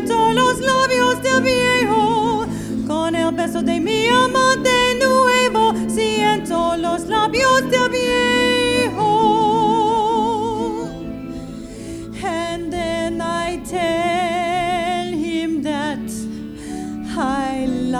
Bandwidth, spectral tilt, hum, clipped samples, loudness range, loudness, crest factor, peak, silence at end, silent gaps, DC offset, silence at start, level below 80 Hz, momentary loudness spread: 15 kHz; -4 dB/octave; none; under 0.1%; 7 LU; -18 LUFS; 14 dB; -4 dBFS; 0 s; none; under 0.1%; 0 s; -42 dBFS; 13 LU